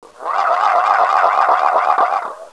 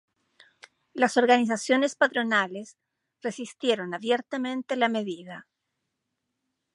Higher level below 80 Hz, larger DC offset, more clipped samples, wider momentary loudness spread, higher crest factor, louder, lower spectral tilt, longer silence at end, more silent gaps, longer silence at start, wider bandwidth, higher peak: first, -74 dBFS vs -82 dBFS; neither; neither; second, 5 LU vs 16 LU; second, 16 dB vs 22 dB; first, -15 LUFS vs -26 LUFS; second, -1 dB/octave vs -3.5 dB/octave; second, 0.05 s vs 1.35 s; neither; second, 0.2 s vs 0.95 s; about the same, 11 kHz vs 11.5 kHz; first, 0 dBFS vs -6 dBFS